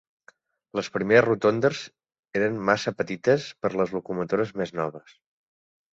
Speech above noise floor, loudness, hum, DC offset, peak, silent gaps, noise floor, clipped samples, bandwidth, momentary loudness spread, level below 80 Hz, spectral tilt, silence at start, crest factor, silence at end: 34 dB; -25 LUFS; none; under 0.1%; -4 dBFS; 2.19-2.23 s; -59 dBFS; under 0.1%; 7.8 kHz; 12 LU; -64 dBFS; -6 dB/octave; 0.75 s; 22 dB; 0.95 s